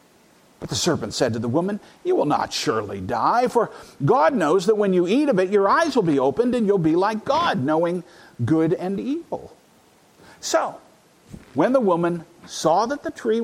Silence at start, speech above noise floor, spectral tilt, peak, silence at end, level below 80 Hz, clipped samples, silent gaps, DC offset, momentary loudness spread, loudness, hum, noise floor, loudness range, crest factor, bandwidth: 0.6 s; 34 dB; -5.5 dB/octave; -4 dBFS; 0 s; -58 dBFS; under 0.1%; none; under 0.1%; 11 LU; -21 LUFS; none; -55 dBFS; 6 LU; 18 dB; 15.5 kHz